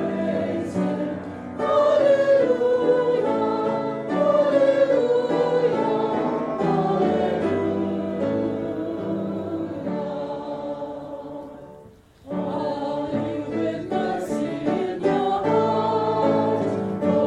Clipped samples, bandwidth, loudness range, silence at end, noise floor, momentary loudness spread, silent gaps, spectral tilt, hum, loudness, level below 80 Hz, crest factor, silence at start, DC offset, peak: under 0.1%; 10.5 kHz; 10 LU; 0 s; -48 dBFS; 12 LU; none; -7.5 dB/octave; none; -23 LUFS; -58 dBFS; 14 dB; 0 s; under 0.1%; -8 dBFS